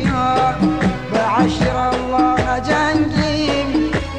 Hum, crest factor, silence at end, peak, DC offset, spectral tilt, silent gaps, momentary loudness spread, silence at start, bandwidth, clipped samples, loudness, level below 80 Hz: none; 14 dB; 0 s; -4 dBFS; 0.7%; -6 dB/octave; none; 3 LU; 0 s; 10 kHz; under 0.1%; -17 LUFS; -32 dBFS